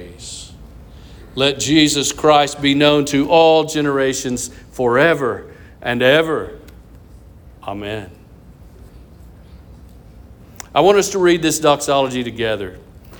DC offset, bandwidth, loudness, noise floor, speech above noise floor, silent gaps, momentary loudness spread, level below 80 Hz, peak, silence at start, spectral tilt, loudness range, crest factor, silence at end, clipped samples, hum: under 0.1%; over 20 kHz; -15 LUFS; -42 dBFS; 26 dB; none; 18 LU; -44 dBFS; -2 dBFS; 0 s; -4 dB/octave; 20 LU; 16 dB; 0 s; under 0.1%; none